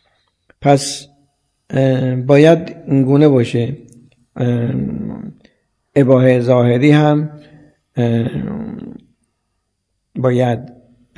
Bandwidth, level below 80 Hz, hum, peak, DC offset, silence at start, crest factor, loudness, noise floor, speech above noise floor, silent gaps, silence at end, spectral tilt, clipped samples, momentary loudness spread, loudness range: 11 kHz; -50 dBFS; none; 0 dBFS; under 0.1%; 0.6 s; 16 dB; -14 LUFS; -70 dBFS; 57 dB; none; 0.45 s; -7 dB/octave; under 0.1%; 17 LU; 7 LU